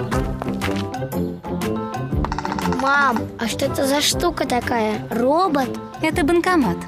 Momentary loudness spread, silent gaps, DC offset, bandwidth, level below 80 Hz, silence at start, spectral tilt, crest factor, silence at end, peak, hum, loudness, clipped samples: 8 LU; none; under 0.1%; 16 kHz; -36 dBFS; 0 s; -4.5 dB/octave; 16 dB; 0 s; -4 dBFS; none; -21 LUFS; under 0.1%